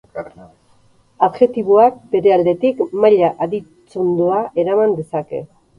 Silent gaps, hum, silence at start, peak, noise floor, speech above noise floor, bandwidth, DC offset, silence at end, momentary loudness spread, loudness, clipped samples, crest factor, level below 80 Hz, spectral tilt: none; none; 0.15 s; 0 dBFS; -53 dBFS; 38 dB; 5.4 kHz; under 0.1%; 0.35 s; 16 LU; -16 LUFS; under 0.1%; 16 dB; -58 dBFS; -8.5 dB/octave